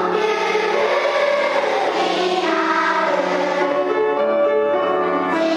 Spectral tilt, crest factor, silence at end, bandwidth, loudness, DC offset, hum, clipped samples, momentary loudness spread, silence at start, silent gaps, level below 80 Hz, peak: -4 dB/octave; 12 dB; 0 s; 11 kHz; -18 LUFS; under 0.1%; none; under 0.1%; 2 LU; 0 s; none; -74 dBFS; -6 dBFS